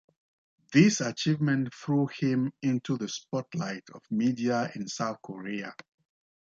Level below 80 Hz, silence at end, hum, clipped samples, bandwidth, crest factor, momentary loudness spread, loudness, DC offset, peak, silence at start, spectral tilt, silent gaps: -72 dBFS; 0.7 s; none; under 0.1%; 7.8 kHz; 22 dB; 13 LU; -29 LUFS; under 0.1%; -8 dBFS; 0.7 s; -5.5 dB/octave; none